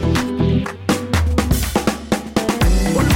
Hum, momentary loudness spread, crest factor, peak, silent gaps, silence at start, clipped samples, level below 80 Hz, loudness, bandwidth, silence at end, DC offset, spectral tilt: none; 4 LU; 12 dB; -6 dBFS; none; 0 s; under 0.1%; -22 dBFS; -18 LUFS; 17 kHz; 0 s; under 0.1%; -5.5 dB/octave